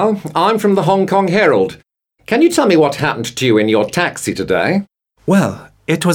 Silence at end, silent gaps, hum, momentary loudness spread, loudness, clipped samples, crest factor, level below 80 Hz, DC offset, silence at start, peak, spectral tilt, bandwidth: 0 s; none; none; 8 LU; -14 LUFS; under 0.1%; 12 dB; -52 dBFS; under 0.1%; 0 s; -2 dBFS; -5.5 dB/octave; 17.5 kHz